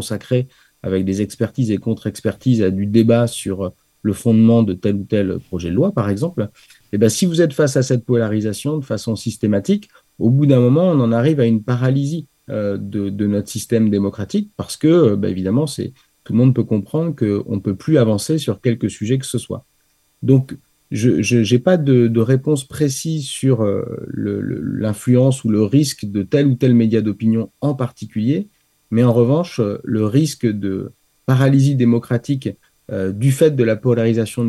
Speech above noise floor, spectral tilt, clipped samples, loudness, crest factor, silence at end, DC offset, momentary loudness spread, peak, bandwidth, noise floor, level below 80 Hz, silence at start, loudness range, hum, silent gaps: 45 dB; -7 dB/octave; under 0.1%; -17 LUFS; 16 dB; 0 s; under 0.1%; 10 LU; 0 dBFS; 12.5 kHz; -61 dBFS; -54 dBFS; 0 s; 3 LU; none; none